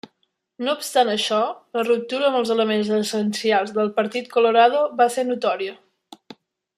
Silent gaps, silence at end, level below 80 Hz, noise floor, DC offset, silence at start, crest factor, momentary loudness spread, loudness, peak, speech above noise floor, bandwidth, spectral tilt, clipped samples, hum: none; 1.05 s; -76 dBFS; -71 dBFS; under 0.1%; 0.6 s; 18 dB; 8 LU; -21 LUFS; -4 dBFS; 51 dB; 15 kHz; -4 dB/octave; under 0.1%; none